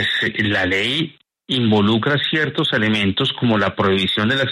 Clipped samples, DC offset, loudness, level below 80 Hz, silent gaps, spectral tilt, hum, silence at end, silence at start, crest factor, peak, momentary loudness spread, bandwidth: under 0.1%; under 0.1%; -18 LUFS; -52 dBFS; none; -6 dB/octave; none; 0 s; 0 s; 14 dB; -4 dBFS; 4 LU; 12 kHz